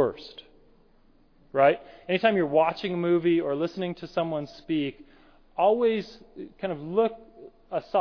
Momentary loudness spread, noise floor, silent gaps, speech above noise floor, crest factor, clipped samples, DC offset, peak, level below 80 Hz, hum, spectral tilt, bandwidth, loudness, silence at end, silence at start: 16 LU; -59 dBFS; none; 33 dB; 20 dB; under 0.1%; under 0.1%; -8 dBFS; -60 dBFS; none; -7.5 dB/octave; 5.4 kHz; -26 LUFS; 0 s; 0 s